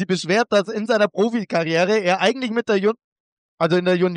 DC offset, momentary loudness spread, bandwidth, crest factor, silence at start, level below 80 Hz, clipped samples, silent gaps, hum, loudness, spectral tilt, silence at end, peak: under 0.1%; 5 LU; 10.5 kHz; 14 dB; 0 s; -72 dBFS; under 0.1%; 3.04-3.58 s; none; -19 LUFS; -5.5 dB/octave; 0 s; -6 dBFS